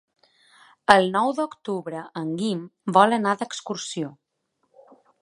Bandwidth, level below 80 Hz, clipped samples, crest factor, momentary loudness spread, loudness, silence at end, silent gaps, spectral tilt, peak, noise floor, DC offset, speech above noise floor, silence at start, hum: 11.5 kHz; -66 dBFS; under 0.1%; 24 dB; 13 LU; -23 LUFS; 1.1 s; none; -4.5 dB/octave; 0 dBFS; -74 dBFS; under 0.1%; 51 dB; 0.9 s; none